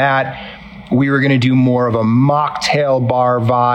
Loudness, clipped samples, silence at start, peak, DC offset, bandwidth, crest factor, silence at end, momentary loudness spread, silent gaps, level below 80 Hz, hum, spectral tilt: -14 LUFS; under 0.1%; 0 s; -4 dBFS; under 0.1%; 10.5 kHz; 10 dB; 0 s; 10 LU; none; -48 dBFS; none; -7 dB/octave